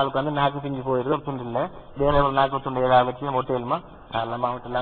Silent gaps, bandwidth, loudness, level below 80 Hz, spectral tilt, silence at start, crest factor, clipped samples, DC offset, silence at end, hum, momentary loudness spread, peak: none; 4.6 kHz; -24 LUFS; -42 dBFS; -10.5 dB/octave; 0 s; 18 dB; under 0.1%; under 0.1%; 0 s; none; 9 LU; -6 dBFS